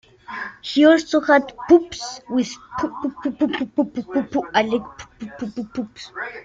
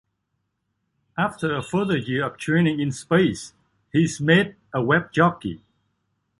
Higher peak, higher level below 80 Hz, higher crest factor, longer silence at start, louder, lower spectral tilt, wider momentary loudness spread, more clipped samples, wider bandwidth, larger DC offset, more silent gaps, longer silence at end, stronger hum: about the same, -2 dBFS vs -4 dBFS; about the same, -56 dBFS vs -56 dBFS; about the same, 18 dB vs 20 dB; second, 0.3 s vs 1.15 s; about the same, -20 LUFS vs -22 LUFS; second, -4.5 dB/octave vs -6 dB/octave; about the same, 15 LU vs 15 LU; neither; second, 7.8 kHz vs 11.5 kHz; neither; neither; second, 0 s vs 0.85 s; neither